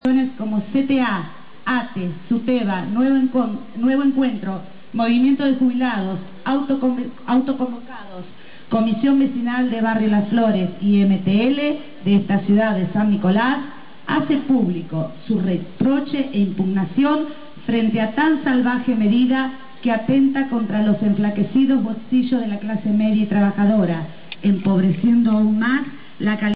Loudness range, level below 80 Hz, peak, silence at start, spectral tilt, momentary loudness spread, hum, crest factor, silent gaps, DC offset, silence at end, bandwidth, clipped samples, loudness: 3 LU; -62 dBFS; -8 dBFS; 0 s; -10 dB/octave; 10 LU; none; 12 dB; none; 2%; 0 s; 5 kHz; under 0.1%; -19 LUFS